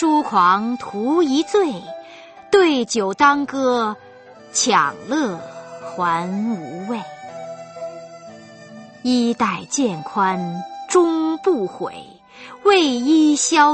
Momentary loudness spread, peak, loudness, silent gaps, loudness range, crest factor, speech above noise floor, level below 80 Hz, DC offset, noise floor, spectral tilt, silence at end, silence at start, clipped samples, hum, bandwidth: 19 LU; 0 dBFS; -18 LUFS; none; 8 LU; 18 dB; 25 dB; -64 dBFS; under 0.1%; -43 dBFS; -3.5 dB/octave; 0 s; 0 s; under 0.1%; none; 8.8 kHz